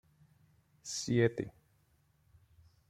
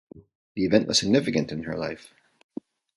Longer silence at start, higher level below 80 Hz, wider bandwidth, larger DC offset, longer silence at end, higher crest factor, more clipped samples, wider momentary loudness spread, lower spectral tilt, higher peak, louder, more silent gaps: first, 0.85 s vs 0.15 s; second, -68 dBFS vs -56 dBFS; first, 14 kHz vs 11.5 kHz; neither; first, 1.4 s vs 1 s; about the same, 24 dB vs 22 dB; neither; second, 16 LU vs 21 LU; about the same, -5 dB/octave vs -4.5 dB/octave; second, -14 dBFS vs -4 dBFS; second, -34 LUFS vs -24 LUFS; second, none vs 0.35-0.55 s